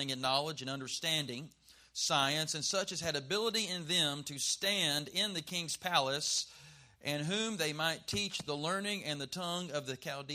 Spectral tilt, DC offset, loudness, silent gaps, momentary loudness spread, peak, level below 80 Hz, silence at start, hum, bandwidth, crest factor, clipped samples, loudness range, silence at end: -2.5 dB/octave; under 0.1%; -34 LUFS; none; 9 LU; -14 dBFS; -72 dBFS; 0 s; none; 15.5 kHz; 22 dB; under 0.1%; 3 LU; 0 s